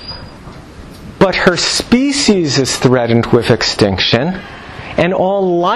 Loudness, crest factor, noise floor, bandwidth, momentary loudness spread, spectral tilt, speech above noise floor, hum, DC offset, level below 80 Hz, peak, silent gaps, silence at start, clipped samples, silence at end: -12 LUFS; 14 dB; -33 dBFS; 13 kHz; 18 LU; -4.5 dB/octave; 21 dB; none; under 0.1%; -38 dBFS; 0 dBFS; none; 0 s; under 0.1%; 0 s